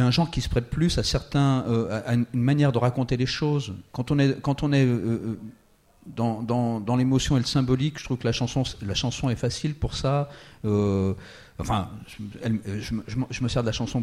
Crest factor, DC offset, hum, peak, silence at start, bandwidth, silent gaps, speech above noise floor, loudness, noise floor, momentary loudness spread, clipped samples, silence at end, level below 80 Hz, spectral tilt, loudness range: 16 dB; under 0.1%; none; -10 dBFS; 0 s; 12.5 kHz; none; 31 dB; -25 LUFS; -56 dBFS; 11 LU; under 0.1%; 0 s; -42 dBFS; -6 dB/octave; 4 LU